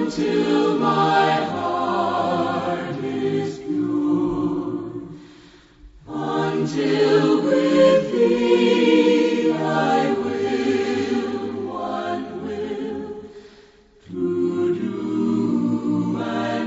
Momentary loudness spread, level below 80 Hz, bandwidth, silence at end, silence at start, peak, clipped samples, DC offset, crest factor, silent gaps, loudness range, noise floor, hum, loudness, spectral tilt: 12 LU; -56 dBFS; 8 kHz; 0 s; 0 s; -4 dBFS; under 0.1%; under 0.1%; 16 dB; none; 9 LU; -50 dBFS; none; -21 LUFS; -6.5 dB/octave